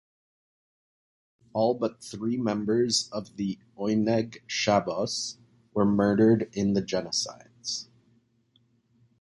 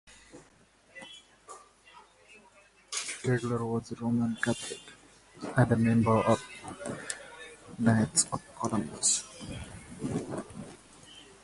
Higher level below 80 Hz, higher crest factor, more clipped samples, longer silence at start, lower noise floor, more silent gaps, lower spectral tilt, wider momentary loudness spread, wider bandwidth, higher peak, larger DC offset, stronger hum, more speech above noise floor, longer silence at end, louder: about the same, -62 dBFS vs -58 dBFS; about the same, 20 dB vs 24 dB; neither; first, 1.55 s vs 0.05 s; first, -67 dBFS vs -62 dBFS; neither; about the same, -4.5 dB/octave vs -4.5 dB/octave; second, 12 LU vs 25 LU; about the same, 11.5 kHz vs 11.5 kHz; about the same, -8 dBFS vs -8 dBFS; neither; neither; first, 41 dB vs 33 dB; first, 1.35 s vs 0.2 s; first, -27 LUFS vs -30 LUFS